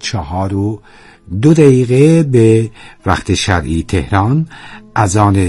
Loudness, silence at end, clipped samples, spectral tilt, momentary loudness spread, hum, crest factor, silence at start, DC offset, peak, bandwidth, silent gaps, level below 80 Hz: -12 LUFS; 0 s; 0.4%; -6.5 dB/octave; 13 LU; none; 12 dB; 0 s; under 0.1%; 0 dBFS; 12 kHz; none; -36 dBFS